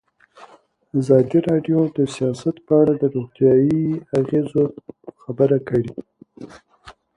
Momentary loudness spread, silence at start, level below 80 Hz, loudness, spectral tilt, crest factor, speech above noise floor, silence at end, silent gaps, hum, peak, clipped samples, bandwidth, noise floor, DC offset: 17 LU; 0.4 s; -56 dBFS; -19 LUFS; -8.5 dB/octave; 18 dB; 30 dB; 0.25 s; none; none; -2 dBFS; under 0.1%; 11 kHz; -49 dBFS; under 0.1%